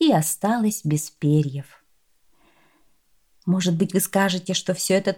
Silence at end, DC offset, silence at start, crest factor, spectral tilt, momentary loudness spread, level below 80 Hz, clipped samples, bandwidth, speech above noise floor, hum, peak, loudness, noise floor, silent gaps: 0 s; under 0.1%; 0 s; 16 dB; -5 dB/octave; 5 LU; -66 dBFS; under 0.1%; 19 kHz; 43 dB; none; -8 dBFS; -22 LUFS; -65 dBFS; none